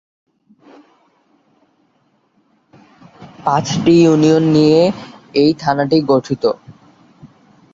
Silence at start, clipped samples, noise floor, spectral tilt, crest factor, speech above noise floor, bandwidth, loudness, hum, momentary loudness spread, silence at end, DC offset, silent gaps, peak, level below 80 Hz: 3.2 s; under 0.1%; -60 dBFS; -6.5 dB/octave; 16 dB; 47 dB; 7.8 kHz; -14 LUFS; none; 10 LU; 0.45 s; under 0.1%; none; 0 dBFS; -52 dBFS